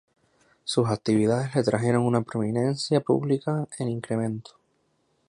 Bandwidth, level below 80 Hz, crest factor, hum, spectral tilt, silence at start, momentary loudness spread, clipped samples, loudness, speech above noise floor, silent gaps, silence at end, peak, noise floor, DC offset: 11 kHz; -62 dBFS; 18 dB; none; -6.5 dB/octave; 0.65 s; 8 LU; under 0.1%; -25 LUFS; 45 dB; none; 0.85 s; -8 dBFS; -70 dBFS; under 0.1%